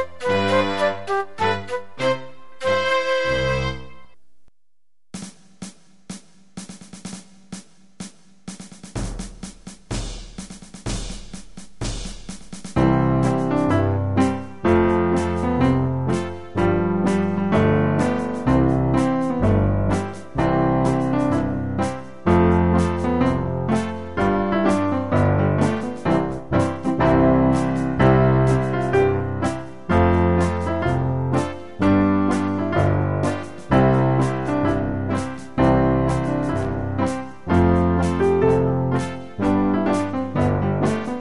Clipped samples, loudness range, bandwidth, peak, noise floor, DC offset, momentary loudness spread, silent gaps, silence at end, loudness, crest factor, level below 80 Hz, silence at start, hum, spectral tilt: under 0.1%; 16 LU; 11.5 kHz; -4 dBFS; -87 dBFS; 1%; 19 LU; none; 0 s; -20 LUFS; 18 dB; -36 dBFS; 0 s; none; -7 dB/octave